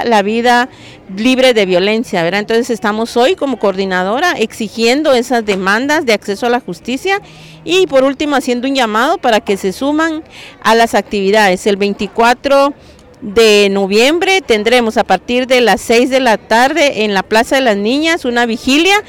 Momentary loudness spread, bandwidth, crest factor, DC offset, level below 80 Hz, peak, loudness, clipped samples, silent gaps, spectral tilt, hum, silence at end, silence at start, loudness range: 6 LU; 17 kHz; 10 dB; 0.2%; -44 dBFS; -2 dBFS; -12 LUFS; under 0.1%; none; -3.5 dB/octave; none; 0.05 s; 0 s; 3 LU